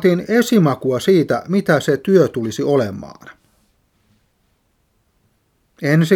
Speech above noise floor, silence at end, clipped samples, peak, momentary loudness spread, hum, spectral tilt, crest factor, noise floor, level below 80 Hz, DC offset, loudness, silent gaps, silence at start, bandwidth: 48 dB; 0 s; under 0.1%; 0 dBFS; 9 LU; none; -6.5 dB/octave; 18 dB; -63 dBFS; -58 dBFS; under 0.1%; -16 LUFS; none; 0 s; 18 kHz